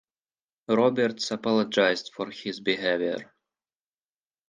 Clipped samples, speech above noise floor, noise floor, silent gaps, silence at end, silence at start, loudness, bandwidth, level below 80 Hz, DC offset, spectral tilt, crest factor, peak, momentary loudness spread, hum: under 0.1%; over 64 dB; under -90 dBFS; none; 1.25 s; 0.7 s; -26 LUFS; 9.6 kHz; -74 dBFS; under 0.1%; -4.5 dB/octave; 20 dB; -8 dBFS; 11 LU; none